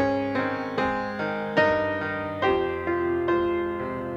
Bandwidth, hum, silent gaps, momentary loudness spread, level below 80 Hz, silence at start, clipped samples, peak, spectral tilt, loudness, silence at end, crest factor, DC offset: 7.2 kHz; none; none; 6 LU; -52 dBFS; 0 s; under 0.1%; -8 dBFS; -7 dB/octave; -26 LUFS; 0 s; 18 dB; under 0.1%